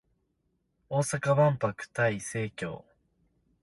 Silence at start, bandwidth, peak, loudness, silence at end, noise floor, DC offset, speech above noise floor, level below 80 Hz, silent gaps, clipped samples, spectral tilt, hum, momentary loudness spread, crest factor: 0.9 s; 11.5 kHz; -12 dBFS; -29 LUFS; 0.85 s; -76 dBFS; under 0.1%; 48 dB; -64 dBFS; none; under 0.1%; -5.5 dB/octave; none; 14 LU; 18 dB